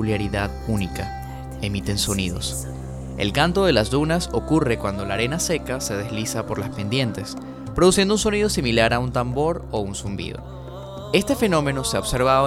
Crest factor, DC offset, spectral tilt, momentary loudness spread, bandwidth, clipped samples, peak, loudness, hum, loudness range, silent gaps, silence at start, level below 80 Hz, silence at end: 20 dB; under 0.1%; -4.5 dB/octave; 14 LU; 16.5 kHz; under 0.1%; -2 dBFS; -22 LUFS; none; 3 LU; none; 0 s; -36 dBFS; 0 s